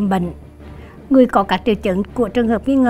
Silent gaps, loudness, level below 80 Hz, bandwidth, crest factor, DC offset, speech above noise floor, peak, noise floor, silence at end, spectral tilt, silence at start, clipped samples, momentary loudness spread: none; -17 LUFS; -40 dBFS; 12.5 kHz; 16 dB; under 0.1%; 21 dB; 0 dBFS; -36 dBFS; 0 s; -7.5 dB/octave; 0 s; under 0.1%; 22 LU